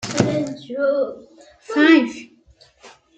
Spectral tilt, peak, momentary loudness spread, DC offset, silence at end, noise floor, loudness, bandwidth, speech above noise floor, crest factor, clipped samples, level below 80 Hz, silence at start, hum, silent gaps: -5 dB/octave; -2 dBFS; 14 LU; under 0.1%; 0.3 s; -53 dBFS; -19 LUFS; 9 kHz; 34 dB; 18 dB; under 0.1%; -58 dBFS; 0 s; none; none